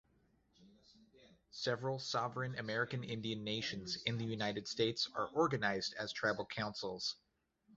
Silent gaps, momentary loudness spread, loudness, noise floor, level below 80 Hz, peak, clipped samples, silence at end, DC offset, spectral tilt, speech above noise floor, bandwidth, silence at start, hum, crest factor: none; 6 LU; -39 LUFS; -74 dBFS; -72 dBFS; -20 dBFS; under 0.1%; 0 s; under 0.1%; -3 dB/octave; 35 dB; 8 kHz; 0.6 s; none; 20 dB